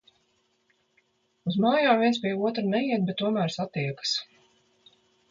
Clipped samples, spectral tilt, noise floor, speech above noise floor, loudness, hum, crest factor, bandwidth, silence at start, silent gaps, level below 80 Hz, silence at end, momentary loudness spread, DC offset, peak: under 0.1%; -5.5 dB/octave; -70 dBFS; 45 dB; -26 LUFS; none; 20 dB; 7.6 kHz; 1.45 s; none; -72 dBFS; 1.05 s; 9 LU; under 0.1%; -8 dBFS